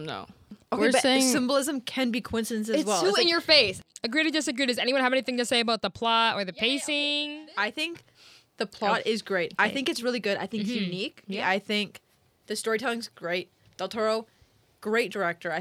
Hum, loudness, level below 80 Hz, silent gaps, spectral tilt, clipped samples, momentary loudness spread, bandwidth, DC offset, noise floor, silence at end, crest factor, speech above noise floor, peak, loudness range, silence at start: none; -26 LUFS; -66 dBFS; none; -3 dB/octave; under 0.1%; 12 LU; 16.5 kHz; under 0.1%; -56 dBFS; 0 s; 22 dB; 29 dB; -6 dBFS; 7 LU; 0 s